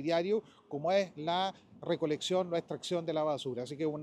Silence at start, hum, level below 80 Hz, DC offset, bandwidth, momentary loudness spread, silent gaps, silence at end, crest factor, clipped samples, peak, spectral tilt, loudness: 0 s; none; -78 dBFS; under 0.1%; 13 kHz; 6 LU; none; 0 s; 16 dB; under 0.1%; -18 dBFS; -5 dB/octave; -34 LUFS